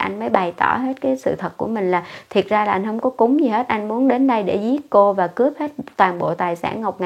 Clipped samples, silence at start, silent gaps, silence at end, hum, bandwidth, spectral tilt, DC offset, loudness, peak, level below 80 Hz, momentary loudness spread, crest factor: under 0.1%; 0 s; none; 0 s; none; 11.5 kHz; -7 dB/octave; under 0.1%; -19 LUFS; 0 dBFS; -60 dBFS; 7 LU; 18 dB